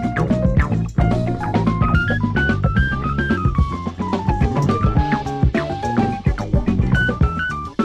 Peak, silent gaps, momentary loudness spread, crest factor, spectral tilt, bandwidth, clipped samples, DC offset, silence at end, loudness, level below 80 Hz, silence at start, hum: -6 dBFS; none; 4 LU; 12 dB; -8 dB/octave; 9.2 kHz; under 0.1%; under 0.1%; 0 s; -19 LUFS; -24 dBFS; 0 s; none